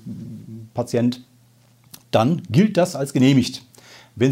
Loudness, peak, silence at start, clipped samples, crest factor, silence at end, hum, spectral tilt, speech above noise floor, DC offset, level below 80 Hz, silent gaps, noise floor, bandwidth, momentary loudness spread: -20 LUFS; -4 dBFS; 0.05 s; under 0.1%; 18 dB; 0 s; none; -6.5 dB/octave; 36 dB; under 0.1%; -64 dBFS; none; -54 dBFS; 16 kHz; 19 LU